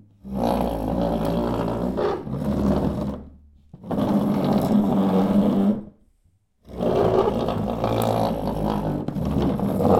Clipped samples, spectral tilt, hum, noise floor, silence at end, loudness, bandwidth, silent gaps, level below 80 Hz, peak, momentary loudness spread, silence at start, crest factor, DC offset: under 0.1%; -8 dB/octave; none; -63 dBFS; 0 s; -23 LUFS; 16 kHz; none; -38 dBFS; -4 dBFS; 8 LU; 0.25 s; 18 dB; under 0.1%